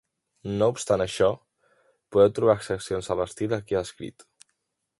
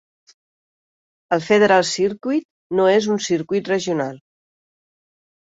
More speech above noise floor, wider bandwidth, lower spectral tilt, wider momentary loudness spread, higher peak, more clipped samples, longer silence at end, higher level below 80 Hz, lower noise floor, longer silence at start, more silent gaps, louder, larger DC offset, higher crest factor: second, 53 dB vs over 72 dB; first, 11.5 kHz vs 8 kHz; about the same, -5.5 dB/octave vs -4.5 dB/octave; first, 17 LU vs 10 LU; second, -6 dBFS vs -2 dBFS; neither; second, 0.9 s vs 1.25 s; first, -54 dBFS vs -64 dBFS; second, -77 dBFS vs under -90 dBFS; second, 0.45 s vs 1.3 s; second, none vs 2.45-2.70 s; second, -25 LUFS vs -19 LUFS; neither; about the same, 20 dB vs 18 dB